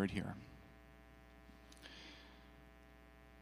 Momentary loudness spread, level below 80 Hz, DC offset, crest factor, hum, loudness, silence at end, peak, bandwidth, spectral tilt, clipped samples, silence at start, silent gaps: 15 LU; -64 dBFS; under 0.1%; 26 dB; none; -53 LUFS; 0 s; -24 dBFS; 15.5 kHz; -6 dB/octave; under 0.1%; 0 s; none